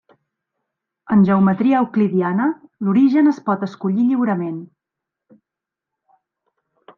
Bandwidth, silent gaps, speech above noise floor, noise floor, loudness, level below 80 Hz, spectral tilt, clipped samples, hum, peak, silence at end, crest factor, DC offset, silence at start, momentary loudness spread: 6.2 kHz; none; 69 dB; -85 dBFS; -17 LUFS; -64 dBFS; -9.5 dB/octave; under 0.1%; none; -6 dBFS; 2.3 s; 14 dB; under 0.1%; 1.1 s; 9 LU